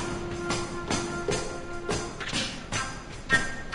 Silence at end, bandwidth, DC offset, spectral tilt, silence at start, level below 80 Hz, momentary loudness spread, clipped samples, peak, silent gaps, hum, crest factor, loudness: 0 s; 11 kHz; under 0.1%; -3.5 dB/octave; 0 s; -42 dBFS; 9 LU; under 0.1%; -10 dBFS; none; none; 20 dB; -30 LUFS